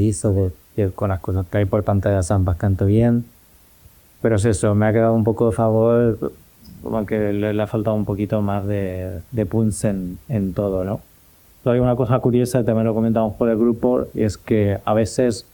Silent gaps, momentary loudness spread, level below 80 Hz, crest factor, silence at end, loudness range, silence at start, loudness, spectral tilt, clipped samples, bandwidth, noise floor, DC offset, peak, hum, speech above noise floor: none; 8 LU; -42 dBFS; 16 dB; 0.1 s; 4 LU; 0 s; -20 LUFS; -7.5 dB/octave; under 0.1%; 19 kHz; -51 dBFS; under 0.1%; -4 dBFS; none; 32 dB